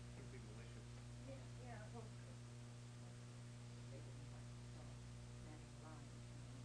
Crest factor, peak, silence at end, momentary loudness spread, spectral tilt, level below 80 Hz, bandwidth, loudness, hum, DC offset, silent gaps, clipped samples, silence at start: 12 dB; -42 dBFS; 0 s; 2 LU; -5.5 dB/octave; -66 dBFS; 11 kHz; -57 LUFS; 60 Hz at -55 dBFS; under 0.1%; none; under 0.1%; 0 s